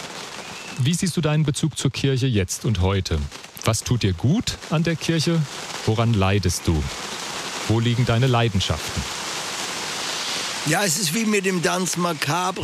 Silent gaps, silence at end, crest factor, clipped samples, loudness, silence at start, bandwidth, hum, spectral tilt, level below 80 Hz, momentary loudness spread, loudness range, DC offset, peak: none; 0 s; 16 dB; under 0.1%; -22 LUFS; 0 s; 15.5 kHz; none; -4.5 dB/octave; -42 dBFS; 8 LU; 1 LU; under 0.1%; -6 dBFS